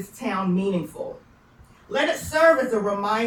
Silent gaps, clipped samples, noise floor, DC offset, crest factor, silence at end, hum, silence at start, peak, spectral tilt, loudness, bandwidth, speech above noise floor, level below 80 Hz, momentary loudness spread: none; under 0.1%; -52 dBFS; under 0.1%; 18 dB; 0 s; none; 0 s; -6 dBFS; -5.5 dB/octave; -22 LUFS; 19 kHz; 30 dB; -56 dBFS; 15 LU